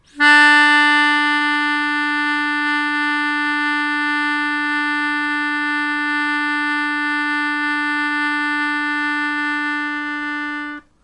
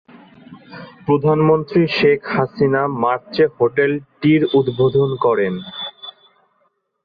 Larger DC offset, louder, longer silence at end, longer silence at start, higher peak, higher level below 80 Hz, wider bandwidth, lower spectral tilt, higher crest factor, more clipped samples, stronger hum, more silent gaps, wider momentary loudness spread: neither; about the same, -17 LUFS vs -17 LUFS; second, 0.25 s vs 0.95 s; second, 0.15 s vs 0.5 s; about the same, -2 dBFS vs -4 dBFS; second, -62 dBFS vs -54 dBFS; first, 11.5 kHz vs 5 kHz; second, -1 dB/octave vs -9 dB/octave; about the same, 16 dB vs 14 dB; neither; neither; neither; second, 9 LU vs 15 LU